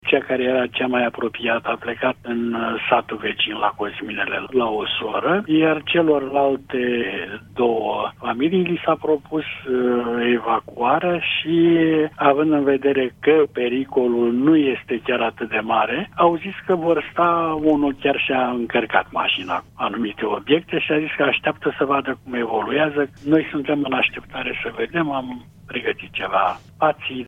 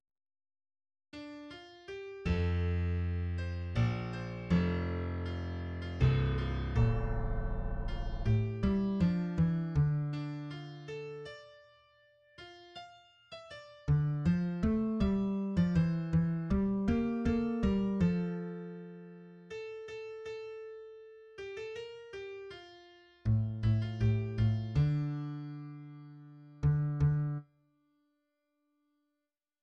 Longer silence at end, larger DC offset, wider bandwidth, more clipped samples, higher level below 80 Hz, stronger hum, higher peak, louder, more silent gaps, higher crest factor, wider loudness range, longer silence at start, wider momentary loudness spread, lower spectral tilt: second, 0 s vs 2.2 s; neither; second, 3.9 kHz vs 7.4 kHz; neither; second, -56 dBFS vs -44 dBFS; neither; first, 0 dBFS vs -16 dBFS; first, -20 LUFS vs -34 LUFS; neither; about the same, 20 dB vs 18 dB; second, 4 LU vs 13 LU; second, 0.05 s vs 1.15 s; second, 8 LU vs 19 LU; second, -7.5 dB/octave vs -9 dB/octave